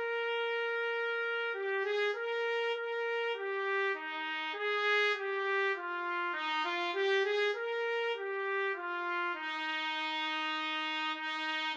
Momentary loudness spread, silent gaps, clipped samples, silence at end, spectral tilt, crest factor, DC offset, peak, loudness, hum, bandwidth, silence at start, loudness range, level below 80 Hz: 5 LU; none; under 0.1%; 0 s; 0 dB/octave; 14 dB; under 0.1%; -20 dBFS; -33 LUFS; none; 8 kHz; 0 s; 2 LU; under -90 dBFS